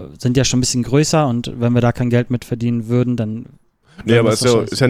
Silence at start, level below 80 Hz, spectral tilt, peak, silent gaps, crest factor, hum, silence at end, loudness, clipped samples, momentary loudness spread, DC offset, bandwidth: 0 s; -42 dBFS; -5.5 dB/octave; -2 dBFS; none; 16 dB; none; 0 s; -16 LUFS; under 0.1%; 8 LU; under 0.1%; 15 kHz